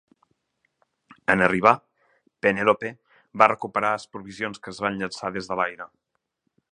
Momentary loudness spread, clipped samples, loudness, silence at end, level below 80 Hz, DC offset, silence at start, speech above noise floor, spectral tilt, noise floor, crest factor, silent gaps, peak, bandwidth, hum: 14 LU; under 0.1%; -23 LUFS; 0.85 s; -60 dBFS; under 0.1%; 1.3 s; 53 dB; -5.5 dB/octave; -76 dBFS; 26 dB; none; 0 dBFS; 10.5 kHz; none